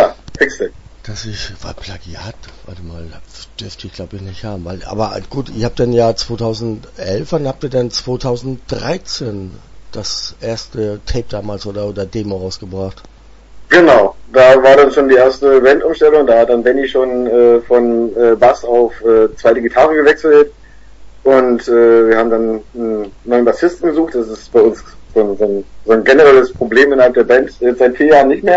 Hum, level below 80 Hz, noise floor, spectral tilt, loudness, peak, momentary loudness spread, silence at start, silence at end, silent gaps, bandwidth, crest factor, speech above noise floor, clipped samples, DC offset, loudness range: none; -36 dBFS; -37 dBFS; -5.5 dB/octave; -11 LUFS; 0 dBFS; 19 LU; 0 s; 0 s; none; 8 kHz; 12 dB; 25 dB; under 0.1%; under 0.1%; 14 LU